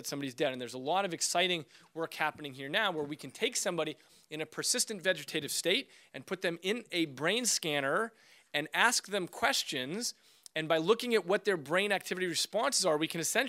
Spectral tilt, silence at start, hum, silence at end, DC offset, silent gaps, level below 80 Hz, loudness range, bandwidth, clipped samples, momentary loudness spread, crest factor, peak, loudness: -2 dB/octave; 0 s; none; 0 s; under 0.1%; none; -80 dBFS; 3 LU; 16 kHz; under 0.1%; 11 LU; 24 dB; -10 dBFS; -32 LUFS